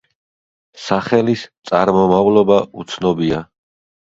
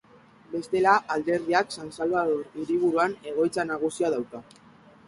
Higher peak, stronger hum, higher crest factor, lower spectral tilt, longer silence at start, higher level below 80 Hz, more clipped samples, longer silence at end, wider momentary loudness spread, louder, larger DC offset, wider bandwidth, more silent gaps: first, 0 dBFS vs -6 dBFS; neither; about the same, 16 dB vs 20 dB; first, -6.5 dB/octave vs -5 dB/octave; first, 0.75 s vs 0.5 s; first, -50 dBFS vs -66 dBFS; neither; about the same, 0.6 s vs 0.65 s; about the same, 11 LU vs 11 LU; first, -16 LUFS vs -26 LUFS; neither; second, 7.8 kHz vs 11.5 kHz; first, 1.58-1.62 s vs none